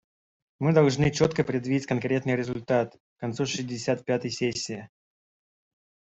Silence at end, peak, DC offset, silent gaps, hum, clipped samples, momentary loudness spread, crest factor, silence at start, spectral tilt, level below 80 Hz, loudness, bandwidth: 1.35 s; -6 dBFS; under 0.1%; 3.00-3.16 s; none; under 0.1%; 12 LU; 20 dB; 0.6 s; -5.5 dB/octave; -58 dBFS; -27 LUFS; 8.2 kHz